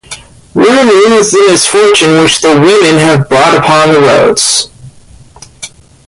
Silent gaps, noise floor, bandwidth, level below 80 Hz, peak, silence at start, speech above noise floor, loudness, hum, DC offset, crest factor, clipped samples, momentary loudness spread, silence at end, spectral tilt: none; -35 dBFS; 11.5 kHz; -42 dBFS; 0 dBFS; 0.1 s; 30 dB; -5 LUFS; none; under 0.1%; 6 dB; under 0.1%; 20 LU; 0.4 s; -3.5 dB/octave